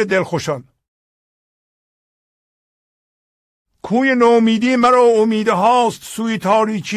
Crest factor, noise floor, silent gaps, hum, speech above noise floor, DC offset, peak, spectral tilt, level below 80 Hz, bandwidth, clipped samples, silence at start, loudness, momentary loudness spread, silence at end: 14 dB; under -90 dBFS; 0.88-3.65 s; none; over 76 dB; under 0.1%; -2 dBFS; -5 dB/octave; -58 dBFS; 14.5 kHz; under 0.1%; 0 s; -15 LUFS; 10 LU; 0 s